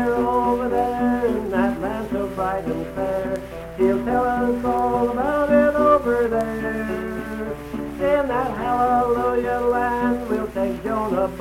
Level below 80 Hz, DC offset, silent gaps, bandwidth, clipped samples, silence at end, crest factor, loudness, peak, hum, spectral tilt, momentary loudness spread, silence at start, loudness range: -40 dBFS; under 0.1%; none; 16 kHz; under 0.1%; 0 s; 16 dB; -21 LUFS; -4 dBFS; none; -7 dB/octave; 9 LU; 0 s; 4 LU